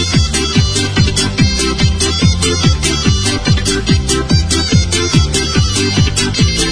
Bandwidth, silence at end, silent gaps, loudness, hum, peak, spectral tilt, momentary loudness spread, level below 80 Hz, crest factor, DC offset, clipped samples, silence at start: 10.5 kHz; 0 s; none; -12 LUFS; none; 0 dBFS; -4 dB/octave; 1 LU; -20 dBFS; 12 dB; 1%; under 0.1%; 0 s